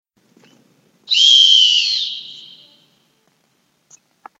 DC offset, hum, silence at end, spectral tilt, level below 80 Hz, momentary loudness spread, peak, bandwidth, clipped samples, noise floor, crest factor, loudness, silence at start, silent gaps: under 0.1%; none; 2 s; 4.5 dB/octave; under -90 dBFS; 20 LU; 0 dBFS; 8 kHz; under 0.1%; -63 dBFS; 18 dB; -10 LUFS; 1.1 s; none